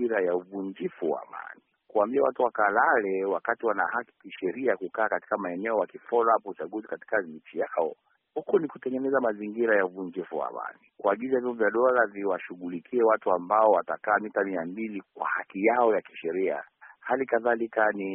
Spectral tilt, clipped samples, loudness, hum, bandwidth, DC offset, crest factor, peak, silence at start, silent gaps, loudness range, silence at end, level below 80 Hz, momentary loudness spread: 1 dB/octave; under 0.1%; -27 LUFS; none; 3.7 kHz; under 0.1%; 20 dB; -8 dBFS; 0 s; none; 4 LU; 0 s; -74 dBFS; 13 LU